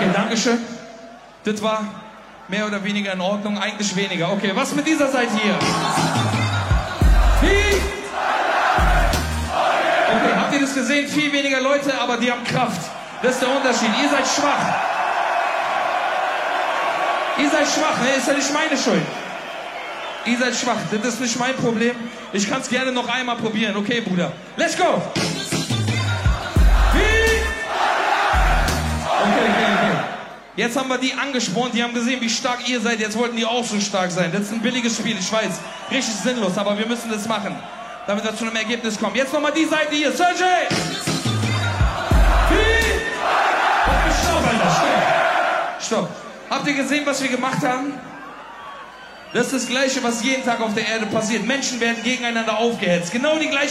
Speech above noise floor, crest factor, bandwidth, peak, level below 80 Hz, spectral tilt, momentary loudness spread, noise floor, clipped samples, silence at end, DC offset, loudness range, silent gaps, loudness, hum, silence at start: 20 dB; 14 dB; 15.5 kHz; -6 dBFS; -28 dBFS; -4 dB/octave; 8 LU; -41 dBFS; under 0.1%; 0 s; under 0.1%; 5 LU; none; -20 LUFS; none; 0 s